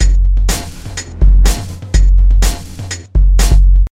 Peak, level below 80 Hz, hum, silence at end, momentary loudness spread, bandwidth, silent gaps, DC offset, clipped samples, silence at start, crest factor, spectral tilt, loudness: 0 dBFS; -10 dBFS; none; 0.05 s; 14 LU; 14.5 kHz; none; under 0.1%; under 0.1%; 0 s; 10 dB; -4.5 dB/octave; -13 LUFS